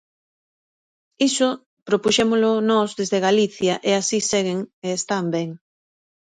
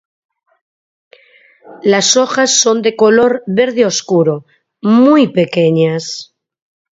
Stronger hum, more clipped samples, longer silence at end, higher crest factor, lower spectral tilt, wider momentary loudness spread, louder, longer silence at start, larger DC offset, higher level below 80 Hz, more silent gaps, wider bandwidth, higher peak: neither; neither; about the same, 0.75 s vs 0.7 s; about the same, 18 dB vs 14 dB; about the same, -3.5 dB/octave vs -4 dB/octave; about the same, 9 LU vs 10 LU; second, -20 LUFS vs -11 LUFS; second, 1.2 s vs 1.7 s; neither; about the same, -62 dBFS vs -60 dBFS; first, 1.66-1.86 s, 4.73-4.82 s vs none; first, 10 kHz vs 7.8 kHz; second, -4 dBFS vs 0 dBFS